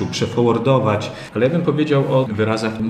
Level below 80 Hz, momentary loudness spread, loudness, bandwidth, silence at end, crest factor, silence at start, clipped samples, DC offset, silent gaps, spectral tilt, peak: -54 dBFS; 4 LU; -18 LUFS; 10.5 kHz; 0 s; 14 dB; 0 s; under 0.1%; under 0.1%; none; -6.5 dB/octave; -4 dBFS